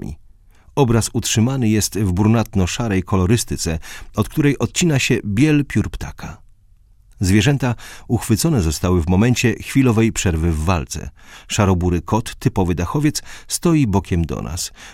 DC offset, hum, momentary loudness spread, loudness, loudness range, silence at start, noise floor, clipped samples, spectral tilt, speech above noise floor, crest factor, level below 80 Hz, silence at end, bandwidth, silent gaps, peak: under 0.1%; none; 11 LU; -18 LUFS; 2 LU; 0 s; -50 dBFS; under 0.1%; -5.5 dB/octave; 32 dB; 18 dB; -34 dBFS; 0 s; 16.5 kHz; none; 0 dBFS